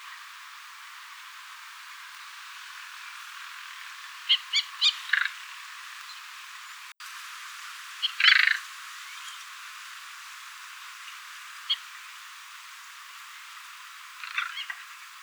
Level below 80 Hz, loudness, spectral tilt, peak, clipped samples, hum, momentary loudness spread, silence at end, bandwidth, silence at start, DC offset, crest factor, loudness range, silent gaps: under -90 dBFS; -28 LUFS; 10 dB/octave; -4 dBFS; under 0.1%; none; 20 LU; 0 s; over 20 kHz; 0 s; under 0.1%; 30 dB; 14 LU; none